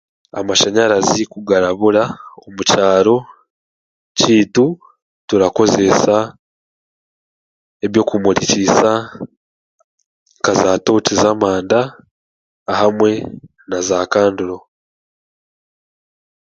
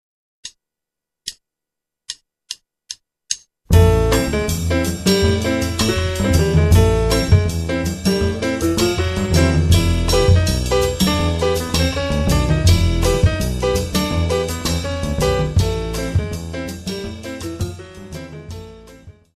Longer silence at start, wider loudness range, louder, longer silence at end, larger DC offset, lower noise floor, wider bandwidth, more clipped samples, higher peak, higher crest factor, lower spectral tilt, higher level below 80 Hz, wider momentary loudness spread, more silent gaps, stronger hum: about the same, 0.35 s vs 0.45 s; second, 3 LU vs 8 LU; first, -14 LUFS vs -18 LUFS; first, 1.9 s vs 0.25 s; neither; first, under -90 dBFS vs -84 dBFS; second, 9.2 kHz vs 14 kHz; neither; about the same, 0 dBFS vs 0 dBFS; about the same, 16 dB vs 16 dB; second, -4 dB/octave vs -5.5 dB/octave; second, -50 dBFS vs -26 dBFS; second, 13 LU vs 18 LU; first, 3.50-4.15 s, 5.02-5.28 s, 6.39-7.80 s, 9.37-9.78 s, 9.84-9.98 s, 10.06-10.26 s, 12.11-12.66 s vs none; neither